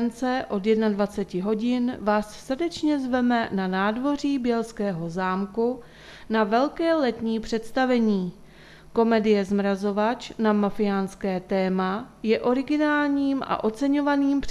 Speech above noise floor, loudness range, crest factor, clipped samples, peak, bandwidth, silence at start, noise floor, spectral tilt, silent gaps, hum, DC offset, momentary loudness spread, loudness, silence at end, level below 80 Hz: 24 dB; 2 LU; 16 dB; under 0.1%; -8 dBFS; 12.5 kHz; 0 s; -47 dBFS; -6.5 dB/octave; none; none; under 0.1%; 6 LU; -24 LUFS; 0 s; -52 dBFS